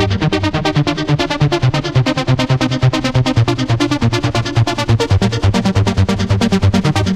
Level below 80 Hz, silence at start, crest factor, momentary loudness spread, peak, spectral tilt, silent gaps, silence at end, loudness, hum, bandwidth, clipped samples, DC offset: -30 dBFS; 0 s; 12 dB; 2 LU; -2 dBFS; -6 dB/octave; none; 0 s; -15 LUFS; none; 12.5 kHz; under 0.1%; under 0.1%